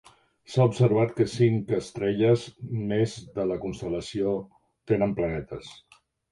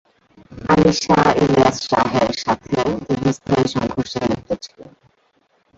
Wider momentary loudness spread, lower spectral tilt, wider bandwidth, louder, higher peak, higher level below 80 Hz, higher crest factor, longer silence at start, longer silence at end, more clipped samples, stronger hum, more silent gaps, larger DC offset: about the same, 11 LU vs 9 LU; first, -7.5 dB/octave vs -5.5 dB/octave; first, 11.5 kHz vs 8 kHz; second, -26 LUFS vs -18 LUFS; second, -8 dBFS vs -2 dBFS; second, -54 dBFS vs -44 dBFS; about the same, 18 dB vs 16 dB; about the same, 0.5 s vs 0.5 s; second, 0.55 s vs 0.9 s; neither; neither; neither; neither